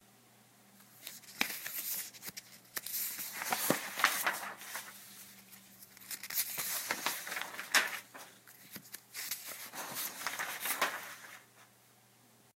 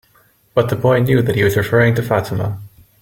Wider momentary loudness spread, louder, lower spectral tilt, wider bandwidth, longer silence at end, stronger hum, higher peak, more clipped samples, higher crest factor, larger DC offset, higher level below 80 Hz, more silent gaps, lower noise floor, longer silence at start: first, 21 LU vs 8 LU; second, -36 LUFS vs -16 LUFS; second, -0.5 dB/octave vs -7 dB/octave; about the same, 16.5 kHz vs 17 kHz; first, 0.9 s vs 0.35 s; neither; second, -10 dBFS vs -2 dBFS; neither; first, 30 dB vs 14 dB; neither; second, -84 dBFS vs -44 dBFS; neither; first, -65 dBFS vs -54 dBFS; second, 0.05 s vs 0.55 s